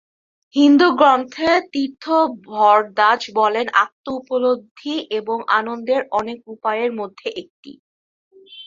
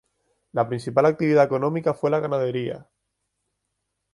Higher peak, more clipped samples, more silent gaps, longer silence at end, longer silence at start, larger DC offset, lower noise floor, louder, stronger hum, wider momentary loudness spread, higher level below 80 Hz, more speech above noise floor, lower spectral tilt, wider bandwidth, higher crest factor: about the same, -2 dBFS vs -4 dBFS; neither; first, 3.92-4.04 s, 4.71-4.75 s, 7.50-7.63 s, 7.79-8.31 s vs none; second, 0 s vs 1.3 s; about the same, 0.55 s vs 0.55 s; neither; first, under -90 dBFS vs -78 dBFS; first, -18 LUFS vs -23 LUFS; neither; about the same, 13 LU vs 11 LU; about the same, -64 dBFS vs -66 dBFS; first, over 72 dB vs 57 dB; second, -4 dB/octave vs -8 dB/octave; second, 7.6 kHz vs 11.5 kHz; about the same, 18 dB vs 20 dB